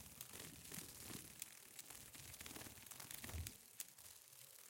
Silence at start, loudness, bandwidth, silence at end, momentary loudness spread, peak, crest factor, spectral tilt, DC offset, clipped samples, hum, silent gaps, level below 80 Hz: 0 s; -54 LUFS; 17 kHz; 0 s; 5 LU; -28 dBFS; 28 dB; -2.5 dB/octave; under 0.1%; under 0.1%; none; none; -70 dBFS